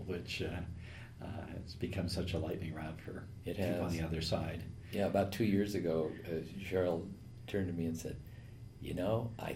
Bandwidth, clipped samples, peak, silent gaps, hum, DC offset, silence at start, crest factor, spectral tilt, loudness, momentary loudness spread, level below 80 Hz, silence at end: 16 kHz; under 0.1%; -20 dBFS; none; none; under 0.1%; 0 s; 18 dB; -6.5 dB/octave; -38 LUFS; 15 LU; -58 dBFS; 0 s